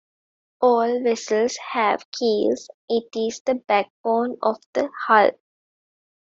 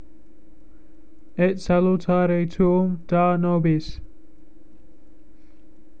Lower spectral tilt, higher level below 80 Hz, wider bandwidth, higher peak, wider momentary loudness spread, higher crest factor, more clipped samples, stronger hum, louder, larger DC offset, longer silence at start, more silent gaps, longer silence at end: second, -3.5 dB/octave vs -9 dB/octave; second, -70 dBFS vs -44 dBFS; about the same, 7.8 kHz vs 7.2 kHz; first, -2 dBFS vs -8 dBFS; about the same, 8 LU vs 8 LU; about the same, 20 dB vs 16 dB; neither; neither; about the same, -22 LUFS vs -21 LUFS; second, under 0.1% vs 2%; second, 0.6 s vs 1.4 s; first, 2.05-2.12 s, 2.74-2.88 s, 3.40-3.45 s, 3.90-4.04 s, 4.66-4.73 s vs none; second, 1.05 s vs 1.9 s